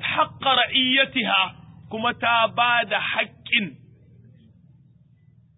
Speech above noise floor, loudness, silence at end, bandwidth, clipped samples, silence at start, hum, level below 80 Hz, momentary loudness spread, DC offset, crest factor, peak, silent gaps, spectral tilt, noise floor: 34 dB; -20 LUFS; 1.85 s; 4 kHz; under 0.1%; 0 s; none; -60 dBFS; 8 LU; under 0.1%; 20 dB; -4 dBFS; none; -8 dB/octave; -55 dBFS